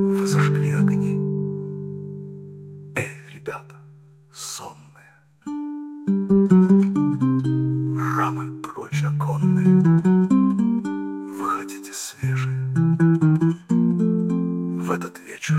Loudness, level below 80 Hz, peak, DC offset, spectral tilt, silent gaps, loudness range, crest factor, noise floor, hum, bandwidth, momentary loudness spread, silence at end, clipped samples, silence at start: -21 LUFS; -60 dBFS; -4 dBFS; under 0.1%; -7.5 dB/octave; none; 13 LU; 16 dB; -53 dBFS; none; 13.5 kHz; 17 LU; 0 s; under 0.1%; 0 s